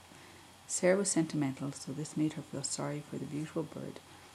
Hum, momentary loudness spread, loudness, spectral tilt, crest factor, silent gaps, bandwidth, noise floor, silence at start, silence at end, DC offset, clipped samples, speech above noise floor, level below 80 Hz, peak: none; 22 LU; -35 LUFS; -4.5 dB/octave; 20 dB; none; 14.5 kHz; -55 dBFS; 0 s; 0 s; under 0.1%; under 0.1%; 21 dB; -76 dBFS; -16 dBFS